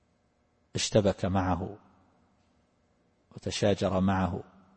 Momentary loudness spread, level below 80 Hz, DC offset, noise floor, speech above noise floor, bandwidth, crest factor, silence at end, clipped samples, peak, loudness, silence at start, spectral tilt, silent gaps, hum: 14 LU; -54 dBFS; under 0.1%; -70 dBFS; 42 dB; 8.8 kHz; 22 dB; 0.35 s; under 0.1%; -10 dBFS; -29 LUFS; 0.75 s; -5.5 dB/octave; none; none